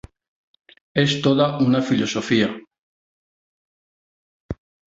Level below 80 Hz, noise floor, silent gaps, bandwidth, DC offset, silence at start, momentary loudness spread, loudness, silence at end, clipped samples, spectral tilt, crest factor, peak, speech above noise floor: -52 dBFS; under -90 dBFS; 2.78-4.49 s; 7.8 kHz; under 0.1%; 0.95 s; 18 LU; -20 LUFS; 0.4 s; under 0.1%; -5.5 dB/octave; 20 dB; -4 dBFS; over 71 dB